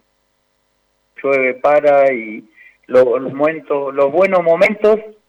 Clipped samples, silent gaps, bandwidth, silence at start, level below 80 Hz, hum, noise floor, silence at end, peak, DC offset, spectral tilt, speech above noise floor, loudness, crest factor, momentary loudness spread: under 0.1%; none; 8.4 kHz; 1.2 s; -60 dBFS; none; -64 dBFS; 0.2 s; -4 dBFS; under 0.1%; -6.5 dB/octave; 50 dB; -14 LUFS; 12 dB; 9 LU